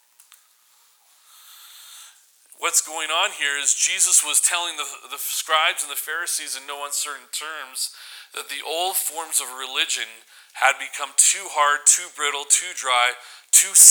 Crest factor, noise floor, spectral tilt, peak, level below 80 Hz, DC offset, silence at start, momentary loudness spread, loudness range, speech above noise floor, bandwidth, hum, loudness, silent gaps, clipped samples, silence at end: 22 dB; -58 dBFS; 4.5 dB/octave; 0 dBFS; -88 dBFS; under 0.1%; 1.6 s; 15 LU; 7 LU; 37 dB; over 20 kHz; none; -19 LUFS; none; under 0.1%; 0 s